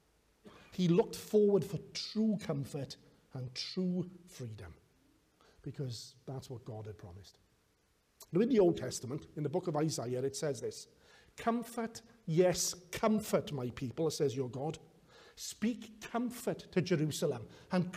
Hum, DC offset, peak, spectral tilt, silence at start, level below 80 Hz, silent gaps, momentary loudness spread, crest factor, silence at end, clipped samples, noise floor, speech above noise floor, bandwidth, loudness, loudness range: none; under 0.1%; -18 dBFS; -5.5 dB/octave; 0.45 s; -68 dBFS; none; 17 LU; 18 dB; 0 s; under 0.1%; -74 dBFS; 38 dB; 15.5 kHz; -35 LUFS; 10 LU